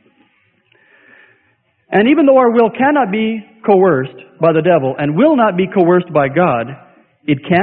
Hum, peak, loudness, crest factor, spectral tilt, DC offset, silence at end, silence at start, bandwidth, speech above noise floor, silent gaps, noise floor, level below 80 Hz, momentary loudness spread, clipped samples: none; 0 dBFS; -13 LUFS; 14 dB; -11 dB/octave; under 0.1%; 0 s; 1.9 s; 4.4 kHz; 47 dB; none; -59 dBFS; -56 dBFS; 10 LU; under 0.1%